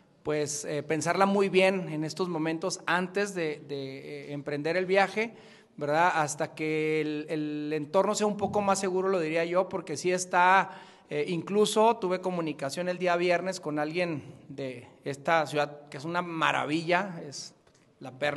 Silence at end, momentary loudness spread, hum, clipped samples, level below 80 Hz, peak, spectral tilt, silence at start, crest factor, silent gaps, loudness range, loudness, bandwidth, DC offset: 0 s; 14 LU; none; under 0.1%; -74 dBFS; -8 dBFS; -4.5 dB/octave; 0.25 s; 22 dB; none; 4 LU; -28 LUFS; 12.5 kHz; under 0.1%